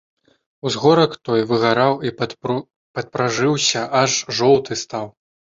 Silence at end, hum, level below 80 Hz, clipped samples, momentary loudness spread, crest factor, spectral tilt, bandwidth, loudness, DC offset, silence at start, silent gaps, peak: 0.5 s; none; -58 dBFS; under 0.1%; 13 LU; 18 dB; -4 dB/octave; 7.8 kHz; -18 LUFS; under 0.1%; 0.65 s; 2.76-2.94 s; -2 dBFS